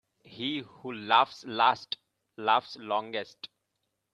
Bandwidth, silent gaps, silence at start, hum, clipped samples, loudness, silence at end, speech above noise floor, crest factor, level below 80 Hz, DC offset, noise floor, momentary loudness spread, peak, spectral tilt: 8.8 kHz; none; 0.3 s; none; under 0.1%; -29 LUFS; 0.7 s; 52 dB; 24 dB; -78 dBFS; under 0.1%; -81 dBFS; 16 LU; -6 dBFS; -4 dB/octave